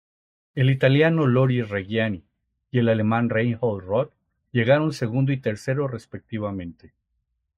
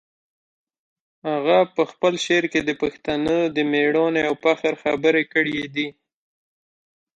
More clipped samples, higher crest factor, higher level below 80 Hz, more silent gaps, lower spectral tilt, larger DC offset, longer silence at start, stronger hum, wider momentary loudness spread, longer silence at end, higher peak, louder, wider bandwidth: neither; about the same, 18 dB vs 18 dB; about the same, -62 dBFS vs -60 dBFS; neither; first, -8 dB/octave vs -4.5 dB/octave; neither; second, 0.55 s vs 1.25 s; neither; first, 14 LU vs 7 LU; second, 0.85 s vs 1.3 s; about the same, -6 dBFS vs -4 dBFS; about the same, -23 LUFS vs -21 LUFS; about the same, 9.4 kHz vs 9.2 kHz